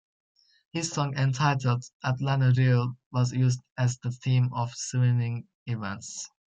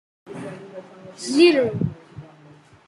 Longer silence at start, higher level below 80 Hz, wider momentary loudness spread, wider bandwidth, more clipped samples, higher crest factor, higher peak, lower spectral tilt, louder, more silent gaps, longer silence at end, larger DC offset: first, 0.75 s vs 0.3 s; about the same, -64 dBFS vs -62 dBFS; second, 12 LU vs 25 LU; second, 8.6 kHz vs 11.5 kHz; neither; second, 14 dB vs 20 dB; second, -12 dBFS vs -4 dBFS; about the same, -6 dB/octave vs -5.5 dB/octave; second, -27 LUFS vs -19 LUFS; first, 1.93-2.00 s, 3.06-3.11 s, 3.72-3.76 s, 5.55-5.66 s vs none; second, 0.3 s vs 0.65 s; neither